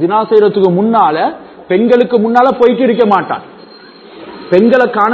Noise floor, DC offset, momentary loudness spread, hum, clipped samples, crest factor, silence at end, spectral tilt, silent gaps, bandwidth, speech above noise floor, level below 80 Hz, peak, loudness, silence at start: -36 dBFS; under 0.1%; 12 LU; none; 0.5%; 10 dB; 0 s; -8 dB/octave; none; 7 kHz; 26 dB; -54 dBFS; 0 dBFS; -10 LUFS; 0 s